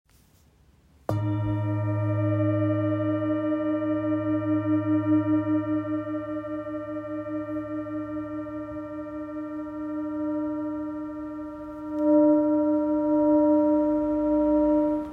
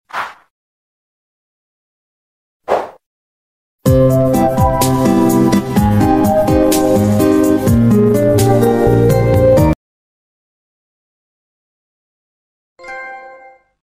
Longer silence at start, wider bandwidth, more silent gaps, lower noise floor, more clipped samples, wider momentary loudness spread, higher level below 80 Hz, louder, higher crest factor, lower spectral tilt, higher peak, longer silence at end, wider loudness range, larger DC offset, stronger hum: first, 1.1 s vs 0.15 s; second, 3.1 kHz vs 16 kHz; second, none vs 0.50-2.60 s, 3.06-3.79 s, 9.75-12.76 s; first, -59 dBFS vs -41 dBFS; neither; about the same, 14 LU vs 15 LU; second, -54 dBFS vs -30 dBFS; second, -26 LUFS vs -12 LUFS; about the same, 16 dB vs 14 dB; first, -10.5 dB/octave vs -7 dB/octave; second, -10 dBFS vs 0 dBFS; second, 0 s vs 0.5 s; second, 10 LU vs 14 LU; neither; neither